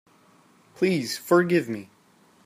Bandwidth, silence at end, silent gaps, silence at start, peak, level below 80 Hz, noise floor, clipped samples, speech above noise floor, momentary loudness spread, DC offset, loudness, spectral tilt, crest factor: 15.5 kHz; 0.6 s; none; 0.8 s; -8 dBFS; -72 dBFS; -59 dBFS; under 0.1%; 36 dB; 13 LU; under 0.1%; -24 LUFS; -5.5 dB/octave; 18 dB